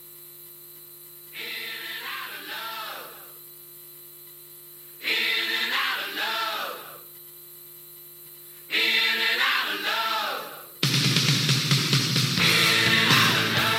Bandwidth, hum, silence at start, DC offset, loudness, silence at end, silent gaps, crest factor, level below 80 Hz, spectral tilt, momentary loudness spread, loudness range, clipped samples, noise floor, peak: 16.5 kHz; 50 Hz at -65 dBFS; 0 s; under 0.1%; -22 LUFS; 0 s; none; 22 dB; -68 dBFS; -2.5 dB/octave; 24 LU; 14 LU; under 0.1%; -46 dBFS; -4 dBFS